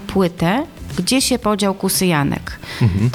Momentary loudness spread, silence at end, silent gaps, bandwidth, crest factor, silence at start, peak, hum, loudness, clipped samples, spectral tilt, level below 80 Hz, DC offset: 8 LU; 0 s; none; 19 kHz; 14 dB; 0 s; -4 dBFS; none; -18 LUFS; under 0.1%; -4.5 dB/octave; -38 dBFS; under 0.1%